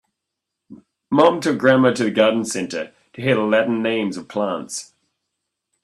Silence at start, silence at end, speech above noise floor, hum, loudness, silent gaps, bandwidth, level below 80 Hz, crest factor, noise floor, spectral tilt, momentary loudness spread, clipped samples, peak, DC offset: 0.7 s; 1 s; 63 dB; none; -19 LUFS; none; 13 kHz; -64 dBFS; 20 dB; -81 dBFS; -5 dB/octave; 12 LU; under 0.1%; 0 dBFS; under 0.1%